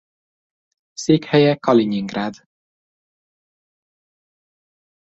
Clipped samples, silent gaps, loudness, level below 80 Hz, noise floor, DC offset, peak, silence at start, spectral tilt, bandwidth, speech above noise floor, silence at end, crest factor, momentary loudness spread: under 0.1%; none; -18 LUFS; -62 dBFS; under -90 dBFS; under 0.1%; -2 dBFS; 1 s; -6 dB/octave; 8 kHz; over 73 dB; 2.7 s; 20 dB; 12 LU